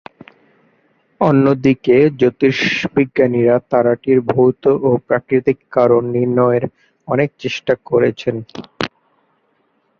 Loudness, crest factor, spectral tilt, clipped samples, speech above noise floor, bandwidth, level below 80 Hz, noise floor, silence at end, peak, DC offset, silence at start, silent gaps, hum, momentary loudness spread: -15 LUFS; 14 dB; -7.5 dB/octave; under 0.1%; 48 dB; 7 kHz; -54 dBFS; -62 dBFS; 1.1 s; -2 dBFS; under 0.1%; 1.2 s; none; none; 10 LU